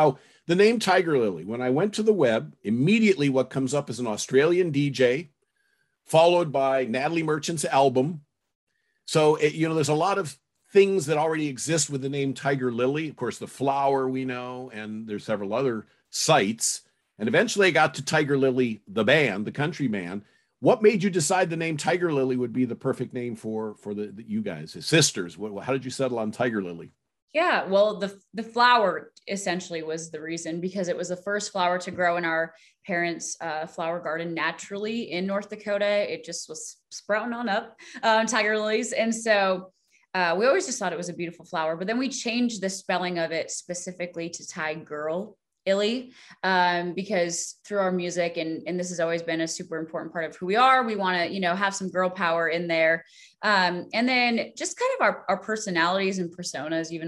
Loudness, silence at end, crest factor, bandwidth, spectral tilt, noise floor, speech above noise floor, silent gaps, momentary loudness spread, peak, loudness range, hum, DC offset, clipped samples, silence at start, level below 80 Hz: -25 LUFS; 0 s; 20 dB; 12.5 kHz; -4 dB/octave; -71 dBFS; 46 dB; 8.55-8.67 s, 27.22-27.28 s; 12 LU; -6 dBFS; 5 LU; none; under 0.1%; under 0.1%; 0 s; -72 dBFS